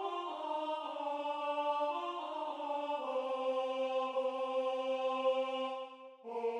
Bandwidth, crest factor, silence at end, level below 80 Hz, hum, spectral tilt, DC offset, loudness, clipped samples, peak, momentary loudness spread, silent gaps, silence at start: 9.6 kHz; 14 dB; 0 s; under -90 dBFS; none; -2.5 dB/octave; under 0.1%; -37 LUFS; under 0.1%; -22 dBFS; 6 LU; none; 0 s